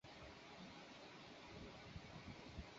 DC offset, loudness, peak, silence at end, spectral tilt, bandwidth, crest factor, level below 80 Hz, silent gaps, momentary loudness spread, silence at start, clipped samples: under 0.1%; -57 LUFS; -40 dBFS; 0 s; -3.5 dB/octave; 7.6 kHz; 18 dB; -66 dBFS; none; 2 LU; 0.05 s; under 0.1%